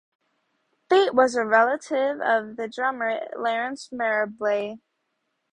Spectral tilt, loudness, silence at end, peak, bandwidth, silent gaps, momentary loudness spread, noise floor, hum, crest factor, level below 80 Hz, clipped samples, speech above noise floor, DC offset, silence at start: -3.5 dB/octave; -23 LUFS; 0.75 s; -4 dBFS; 10.5 kHz; none; 9 LU; -76 dBFS; none; 20 dB; -72 dBFS; under 0.1%; 52 dB; under 0.1%; 0.9 s